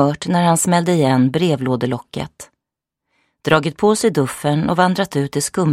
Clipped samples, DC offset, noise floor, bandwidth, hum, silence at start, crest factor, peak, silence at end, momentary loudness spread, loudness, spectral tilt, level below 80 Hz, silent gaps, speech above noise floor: under 0.1%; under 0.1%; -83 dBFS; 15.5 kHz; none; 0 s; 16 dB; 0 dBFS; 0 s; 9 LU; -17 LUFS; -5.5 dB/octave; -52 dBFS; none; 66 dB